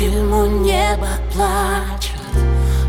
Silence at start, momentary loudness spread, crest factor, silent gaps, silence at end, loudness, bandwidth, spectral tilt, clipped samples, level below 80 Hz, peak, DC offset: 0 s; 6 LU; 12 dB; none; 0 s; -18 LUFS; 16.5 kHz; -5.5 dB/octave; under 0.1%; -18 dBFS; -4 dBFS; under 0.1%